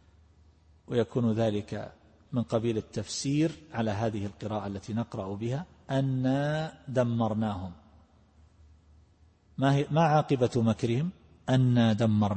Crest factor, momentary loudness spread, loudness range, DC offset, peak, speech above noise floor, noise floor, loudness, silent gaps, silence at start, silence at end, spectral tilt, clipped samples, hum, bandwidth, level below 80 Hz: 16 dB; 11 LU; 5 LU; under 0.1%; -14 dBFS; 33 dB; -61 dBFS; -29 LUFS; none; 0.9 s; 0 s; -7 dB/octave; under 0.1%; none; 8.8 kHz; -58 dBFS